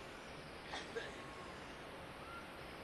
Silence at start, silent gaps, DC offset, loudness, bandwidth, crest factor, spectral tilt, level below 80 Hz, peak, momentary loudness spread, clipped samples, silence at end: 0 s; none; under 0.1%; -49 LUFS; 13 kHz; 18 dB; -4 dB/octave; -66 dBFS; -32 dBFS; 5 LU; under 0.1%; 0 s